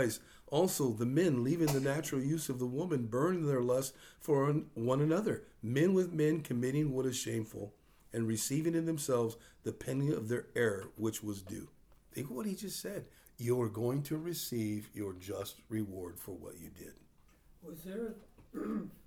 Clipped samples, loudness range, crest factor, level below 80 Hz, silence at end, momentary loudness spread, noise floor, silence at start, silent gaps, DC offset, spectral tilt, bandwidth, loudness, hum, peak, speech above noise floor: under 0.1%; 9 LU; 18 dB; -66 dBFS; 0.05 s; 15 LU; -64 dBFS; 0 s; none; under 0.1%; -6 dB/octave; over 20 kHz; -35 LUFS; none; -18 dBFS; 29 dB